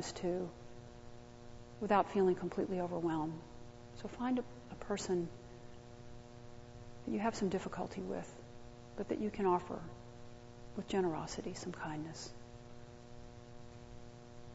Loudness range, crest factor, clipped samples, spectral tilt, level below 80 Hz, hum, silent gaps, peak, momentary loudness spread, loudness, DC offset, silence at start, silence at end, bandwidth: 6 LU; 24 dB; under 0.1%; -5.5 dB/octave; -60 dBFS; none; none; -16 dBFS; 21 LU; -39 LUFS; under 0.1%; 0 s; 0 s; 7.6 kHz